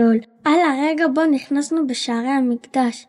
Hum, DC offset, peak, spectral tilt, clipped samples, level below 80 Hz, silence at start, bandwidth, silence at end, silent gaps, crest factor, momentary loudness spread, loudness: none; under 0.1%; -6 dBFS; -4 dB/octave; under 0.1%; -74 dBFS; 0 s; 11 kHz; 0.05 s; none; 12 dB; 5 LU; -19 LUFS